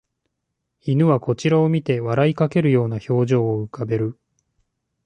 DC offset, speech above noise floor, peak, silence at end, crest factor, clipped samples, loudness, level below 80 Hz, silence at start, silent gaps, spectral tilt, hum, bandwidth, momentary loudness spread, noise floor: under 0.1%; 59 dB; -6 dBFS; 0.95 s; 16 dB; under 0.1%; -20 LUFS; -58 dBFS; 0.85 s; none; -8 dB/octave; none; 9.2 kHz; 7 LU; -78 dBFS